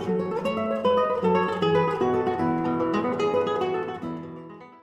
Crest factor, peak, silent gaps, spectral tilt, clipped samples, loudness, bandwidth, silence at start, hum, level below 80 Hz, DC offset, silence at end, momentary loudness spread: 14 dB; -10 dBFS; none; -7.5 dB/octave; under 0.1%; -25 LUFS; 12 kHz; 0 s; none; -60 dBFS; under 0.1%; 0.05 s; 12 LU